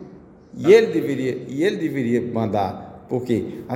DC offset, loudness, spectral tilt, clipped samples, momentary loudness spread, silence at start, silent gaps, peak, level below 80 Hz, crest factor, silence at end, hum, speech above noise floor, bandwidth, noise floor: under 0.1%; -21 LUFS; -7 dB/octave; under 0.1%; 13 LU; 0 s; none; -2 dBFS; -58 dBFS; 20 dB; 0 s; none; 24 dB; 16 kHz; -44 dBFS